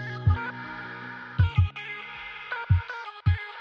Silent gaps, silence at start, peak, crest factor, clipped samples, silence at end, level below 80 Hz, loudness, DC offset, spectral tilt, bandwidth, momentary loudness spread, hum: none; 0 s; -10 dBFS; 16 dB; under 0.1%; 0 s; -38 dBFS; -29 LUFS; under 0.1%; -8 dB/octave; 5.6 kHz; 12 LU; none